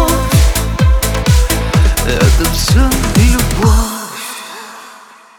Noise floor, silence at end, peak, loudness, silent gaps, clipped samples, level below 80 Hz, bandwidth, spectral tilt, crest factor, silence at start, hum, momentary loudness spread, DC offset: -38 dBFS; 0.45 s; 0 dBFS; -12 LUFS; none; under 0.1%; -14 dBFS; 20 kHz; -4.5 dB/octave; 12 dB; 0 s; none; 13 LU; under 0.1%